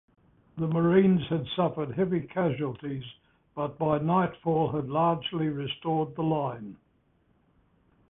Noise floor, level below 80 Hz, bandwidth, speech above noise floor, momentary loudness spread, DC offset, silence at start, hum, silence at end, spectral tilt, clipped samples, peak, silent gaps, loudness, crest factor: -68 dBFS; -60 dBFS; 3.9 kHz; 40 dB; 14 LU; under 0.1%; 0.55 s; none; 1.35 s; -11.5 dB/octave; under 0.1%; -10 dBFS; none; -28 LUFS; 20 dB